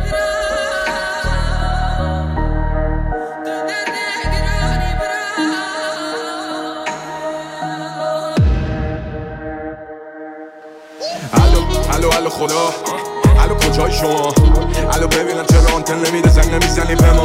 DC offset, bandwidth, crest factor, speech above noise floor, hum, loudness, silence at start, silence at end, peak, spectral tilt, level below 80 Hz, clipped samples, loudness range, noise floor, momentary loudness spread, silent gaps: under 0.1%; 16.5 kHz; 12 dB; 24 dB; none; -17 LUFS; 0 s; 0 s; -2 dBFS; -5 dB/octave; -18 dBFS; under 0.1%; 8 LU; -36 dBFS; 14 LU; none